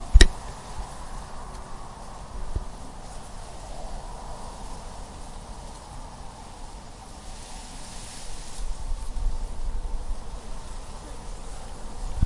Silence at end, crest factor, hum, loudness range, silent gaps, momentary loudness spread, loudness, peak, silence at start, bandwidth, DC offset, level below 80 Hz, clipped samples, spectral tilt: 0 s; 28 dB; none; 4 LU; none; 7 LU; -35 LUFS; 0 dBFS; 0 s; 11.5 kHz; under 0.1%; -28 dBFS; under 0.1%; -4 dB/octave